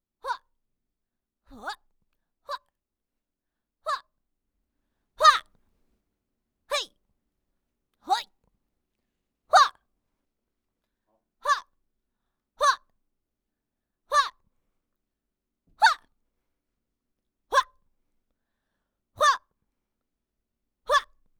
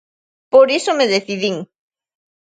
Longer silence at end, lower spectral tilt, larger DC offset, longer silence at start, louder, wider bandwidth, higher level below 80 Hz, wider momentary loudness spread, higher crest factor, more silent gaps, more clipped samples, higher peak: second, 0.35 s vs 0.8 s; second, 1 dB/octave vs -3.5 dB/octave; neither; second, 0.25 s vs 0.55 s; second, -25 LUFS vs -15 LUFS; first, 19 kHz vs 9.2 kHz; about the same, -66 dBFS vs -68 dBFS; first, 19 LU vs 10 LU; first, 26 dB vs 18 dB; neither; neither; second, -6 dBFS vs 0 dBFS